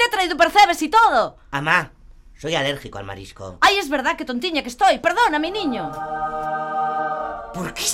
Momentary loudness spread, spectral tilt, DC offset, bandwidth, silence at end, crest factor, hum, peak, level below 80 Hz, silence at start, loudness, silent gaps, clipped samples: 15 LU; -3 dB/octave; under 0.1%; 16.5 kHz; 0 s; 20 dB; none; 0 dBFS; -48 dBFS; 0 s; -19 LUFS; none; under 0.1%